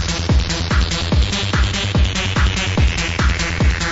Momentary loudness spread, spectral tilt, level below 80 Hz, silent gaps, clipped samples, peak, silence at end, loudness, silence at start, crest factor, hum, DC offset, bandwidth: 1 LU; -4.5 dB/octave; -20 dBFS; none; under 0.1%; -4 dBFS; 0 s; -18 LUFS; 0 s; 12 dB; none; under 0.1%; 8 kHz